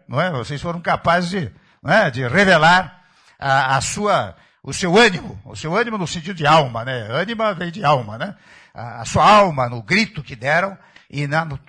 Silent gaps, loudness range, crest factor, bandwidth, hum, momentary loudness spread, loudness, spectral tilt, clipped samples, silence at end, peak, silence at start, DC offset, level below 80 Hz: none; 3 LU; 16 dB; 11 kHz; none; 17 LU; -17 LUFS; -4.5 dB/octave; under 0.1%; 0.1 s; -4 dBFS; 0.1 s; under 0.1%; -48 dBFS